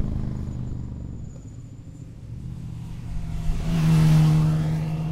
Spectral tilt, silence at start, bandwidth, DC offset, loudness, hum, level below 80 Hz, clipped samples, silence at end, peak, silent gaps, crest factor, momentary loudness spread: -8 dB/octave; 0 s; 12 kHz; under 0.1%; -23 LUFS; none; -32 dBFS; under 0.1%; 0 s; -8 dBFS; none; 16 dB; 23 LU